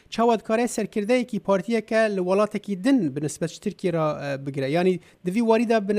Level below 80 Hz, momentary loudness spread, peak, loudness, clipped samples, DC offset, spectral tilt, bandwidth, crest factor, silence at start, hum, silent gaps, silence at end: -64 dBFS; 8 LU; -8 dBFS; -24 LUFS; under 0.1%; under 0.1%; -6 dB/octave; 15 kHz; 16 dB; 0.1 s; none; none; 0 s